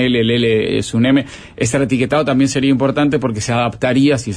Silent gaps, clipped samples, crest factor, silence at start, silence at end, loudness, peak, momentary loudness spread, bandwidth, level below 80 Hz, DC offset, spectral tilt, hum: none; under 0.1%; 12 dB; 0 s; 0 s; -15 LUFS; -4 dBFS; 4 LU; 10.5 kHz; -44 dBFS; under 0.1%; -5.5 dB/octave; none